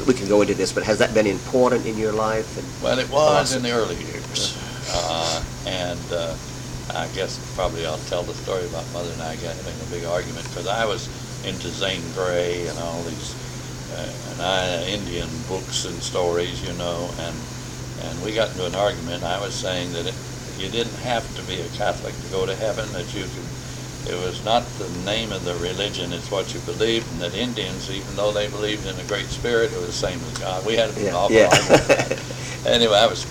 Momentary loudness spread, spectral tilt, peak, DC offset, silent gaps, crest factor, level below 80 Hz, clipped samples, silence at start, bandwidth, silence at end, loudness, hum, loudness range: 12 LU; -4 dB/octave; -2 dBFS; under 0.1%; none; 20 dB; -42 dBFS; under 0.1%; 0 s; 17.5 kHz; 0 s; -23 LUFS; none; 7 LU